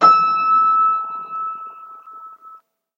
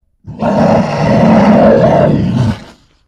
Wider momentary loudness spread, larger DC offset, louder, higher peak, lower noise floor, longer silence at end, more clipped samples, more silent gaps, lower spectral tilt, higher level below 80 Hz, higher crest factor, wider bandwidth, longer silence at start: first, 24 LU vs 9 LU; neither; second, -16 LUFS vs -9 LUFS; about the same, 0 dBFS vs 0 dBFS; first, -46 dBFS vs -37 dBFS; about the same, 0.4 s vs 0.45 s; second, under 0.1% vs 0.3%; neither; second, -4 dB/octave vs -8.5 dB/octave; second, under -90 dBFS vs -32 dBFS; first, 18 dB vs 10 dB; second, 7.2 kHz vs 8.8 kHz; second, 0 s vs 0.25 s